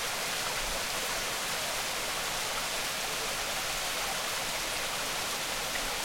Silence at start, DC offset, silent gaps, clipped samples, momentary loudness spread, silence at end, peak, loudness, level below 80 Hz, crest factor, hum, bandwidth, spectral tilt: 0 s; under 0.1%; none; under 0.1%; 1 LU; 0 s; -20 dBFS; -31 LUFS; -50 dBFS; 14 dB; none; 16.5 kHz; -0.5 dB/octave